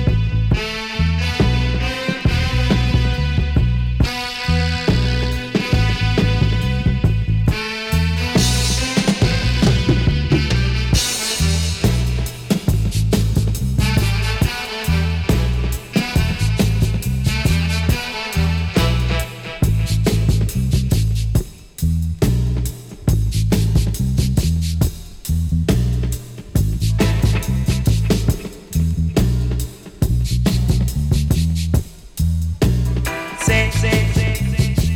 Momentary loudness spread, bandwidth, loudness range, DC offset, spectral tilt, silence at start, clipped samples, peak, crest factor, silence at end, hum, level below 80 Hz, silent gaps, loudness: 5 LU; 17.5 kHz; 2 LU; under 0.1%; -5.5 dB/octave; 0 s; under 0.1%; -6 dBFS; 10 dB; 0 s; none; -22 dBFS; none; -18 LUFS